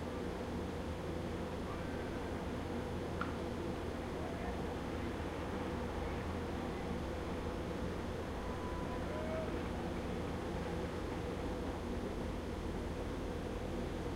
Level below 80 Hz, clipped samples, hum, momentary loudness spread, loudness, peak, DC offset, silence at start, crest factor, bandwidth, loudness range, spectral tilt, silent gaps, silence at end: -48 dBFS; under 0.1%; none; 1 LU; -41 LUFS; -22 dBFS; under 0.1%; 0 s; 18 dB; 16 kHz; 1 LU; -6.5 dB/octave; none; 0 s